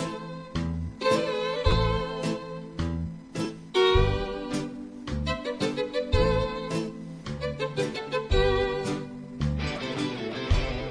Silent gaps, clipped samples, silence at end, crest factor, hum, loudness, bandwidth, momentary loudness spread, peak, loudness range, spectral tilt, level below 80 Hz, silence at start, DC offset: none; under 0.1%; 0 s; 18 dB; none; -28 LUFS; 11 kHz; 11 LU; -10 dBFS; 2 LU; -6 dB/octave; -34 dBFS; 0 s; under 0.1%